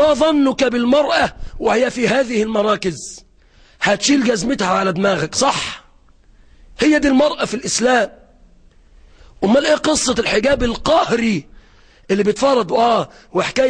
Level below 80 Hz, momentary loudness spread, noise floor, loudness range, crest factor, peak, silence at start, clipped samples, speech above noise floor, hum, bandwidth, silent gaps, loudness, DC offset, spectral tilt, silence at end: -40 dBFS; 8 LU; -49 dBFS; 2 LU; 12 dB; -4 dBFS; 0 s; under 0.1%; 33 dB; none; 10.5 kHz; none; -16 LUFS; under 0.1%; -4 dB/octave; 0 s